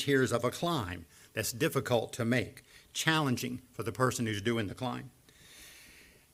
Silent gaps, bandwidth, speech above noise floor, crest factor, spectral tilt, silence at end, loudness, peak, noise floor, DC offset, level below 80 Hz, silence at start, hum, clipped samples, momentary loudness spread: none; 16 kHz; 26 dB; 22 dB; -4.5 dB/octave; 0.3 s; -32 LUFS; -10 dBFS; -58 dBFS; under 0.1%; -64 dBFS; 0 s; none; under 0.1%; 20 LU